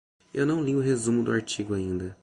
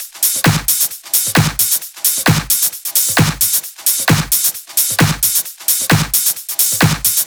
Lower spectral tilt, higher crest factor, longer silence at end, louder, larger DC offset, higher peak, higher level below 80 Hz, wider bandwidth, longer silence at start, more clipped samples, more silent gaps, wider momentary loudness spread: first, -5.5 dB/octave vs -2.5 dB/octave; about the same, 16 dB vs 14 dB; about the same, 0.1 s vs 0 s; second, -27 LUFS vs -13 LUFS; neither; second, -12 dBFS vs 0 dBFS; second, -52 dBFS vs -38 dBFS; second, 11.5 kHz vs over 20 kHz; first, 0.35 s vs 0 s; neither; neither; first, 6 LU vs 3 LU